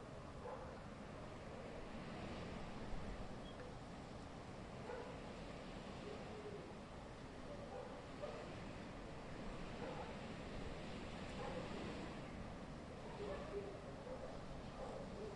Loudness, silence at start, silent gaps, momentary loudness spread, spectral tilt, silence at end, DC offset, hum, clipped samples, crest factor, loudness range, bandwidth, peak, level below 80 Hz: -52 LUFS; 0 s; none; 5 LU; -6 dB/octave; 0 s; under 0.1%; none; under 0.1%; 16 dB; 2 LU; 11 kHz; -34 dBFS; -60 dBFS